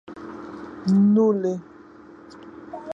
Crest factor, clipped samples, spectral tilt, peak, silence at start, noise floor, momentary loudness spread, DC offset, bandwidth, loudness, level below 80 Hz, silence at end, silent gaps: 16 dB; under 0.1%; -9 dB/octave; -8 dBFS; 0.1 s; -46 dBFS; 25 LU; under 0.1%; 7.2 kHz; -21 LUFS; -62 dBFS; 0 s; none